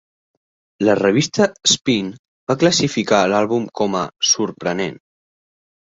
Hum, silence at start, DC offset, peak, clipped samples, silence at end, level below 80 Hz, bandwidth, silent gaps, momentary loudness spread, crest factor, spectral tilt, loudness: none; 0.8 s; under 0.1%; 0 dBFS; under 0.1%; 1 s; -56 dBFS; 8.2 kHz; 2.19-2.47 s; 8 LU; 20 dB; -3.5 dB/octave; -17 LUFS